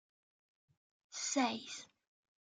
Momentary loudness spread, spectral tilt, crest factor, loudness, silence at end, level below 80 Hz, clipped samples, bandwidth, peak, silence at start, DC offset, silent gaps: 15 LU; -1.5 dB/octave; 22 dB; -38 LUFS; 0.6 s; under -90 dBFS; under 0.1%; 9.8 kHz; -22 dBFS; 1.1 s; under 0.1%; none